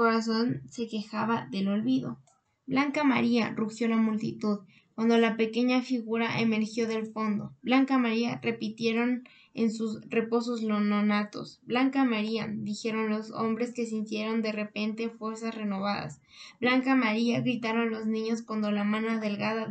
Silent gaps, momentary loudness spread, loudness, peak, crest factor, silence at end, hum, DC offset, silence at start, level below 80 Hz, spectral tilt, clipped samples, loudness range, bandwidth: none; 9 LU; -29 LUFS; -12 dBFS; 16 dB; 0 s; none; under 0.1%; 0 s; -76 dBFS; -6 dB/octave; under 0.1%; 4 LU; 8.6 kHz